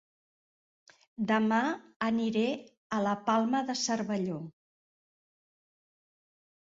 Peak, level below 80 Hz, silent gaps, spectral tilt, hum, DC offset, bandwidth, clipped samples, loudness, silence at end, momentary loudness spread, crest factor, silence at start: -14 dBFS; -74 dBFS; 1.96-2.00 s, 2.77-2.90 s; -4.5 dB/octave; none; under 0.1%; 7.8 kHz; under 0.1%; -31 LUFS; 2.25 s; 11 LU; 18 dB; 1.2 s